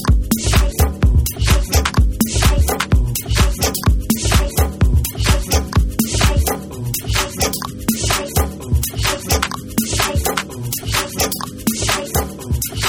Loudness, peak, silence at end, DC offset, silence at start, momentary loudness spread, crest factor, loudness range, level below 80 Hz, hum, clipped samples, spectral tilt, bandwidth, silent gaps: -17 LUFS; 0 dBFS; 0 s; under 0.1%; 0 s; 6 LU; 16 dB; 3 LU; -20 dBFS; none; under 0.1%; -4 dB/octave; 18 kHz; none